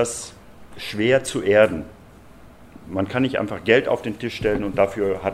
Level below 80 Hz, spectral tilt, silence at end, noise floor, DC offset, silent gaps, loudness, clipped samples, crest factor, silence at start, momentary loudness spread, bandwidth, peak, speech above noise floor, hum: -48 dBFS; -5 dB/octave; 0 s; -45 dBFS; under 0.1%; none; -21 LUFS; under 0.1%; 22 dB; 0 s; 15 LU; 14 kHz; 0 dBFS; 24 dB; none